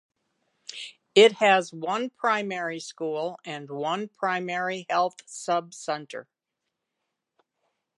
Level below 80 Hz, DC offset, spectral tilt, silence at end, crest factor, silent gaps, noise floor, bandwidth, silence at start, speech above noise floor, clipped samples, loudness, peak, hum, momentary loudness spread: -84 dBFS; under 0.1%; -3.5 dB/octave; 1.75 s; 24 dB; none; -84 dBFS; 11.5 kHz; 0.7 s; 58 dB; under 0.1%; -25 LUFS; -4 dBFS; none; 20 LU